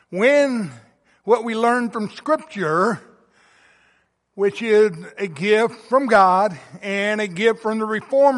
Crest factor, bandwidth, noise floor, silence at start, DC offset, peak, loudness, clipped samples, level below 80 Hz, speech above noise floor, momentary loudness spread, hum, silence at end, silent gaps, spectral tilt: 16 dB; 11.5 kHz; -63 dBFS; 0.1 s; under 0.1%; -2 dBFS; -19 LUFS; under 0.1%; -68 dBFS; 44 dB; 11 LU; none; 0 s; none; -5.5 dB/octave